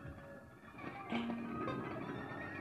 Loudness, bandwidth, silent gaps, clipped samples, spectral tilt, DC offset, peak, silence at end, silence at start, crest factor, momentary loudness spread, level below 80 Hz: -44 LUFS; 13 kHz; none; under 0.1%; -7 dB/octave; under 0.1%; -28 dBFS; 0 s; 0 s; 18 dB; 13 LU; -66 dBFS